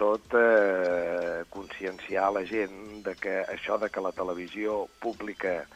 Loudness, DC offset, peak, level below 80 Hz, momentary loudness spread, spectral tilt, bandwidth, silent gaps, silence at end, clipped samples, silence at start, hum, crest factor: -29 LUFS; under 0.1%; -10 dBFS; -62 dBFS; 14 LU; -5.5 dB/octave; 12.5 kHz; none; 0.1 s; under 0.1%; 0 s; none; 20 dB